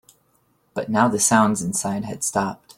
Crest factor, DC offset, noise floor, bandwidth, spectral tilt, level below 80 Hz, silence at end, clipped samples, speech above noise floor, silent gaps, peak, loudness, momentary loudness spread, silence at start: 20 dB; under 0.1%; -64 dBFS; 16.5 kHz; -4 dB/octave; -58 dBFS; 0.05 s; under 0.1%; 43 dB; none; -2 dBFS; -20 LUFS; 11 LU; 0.75 s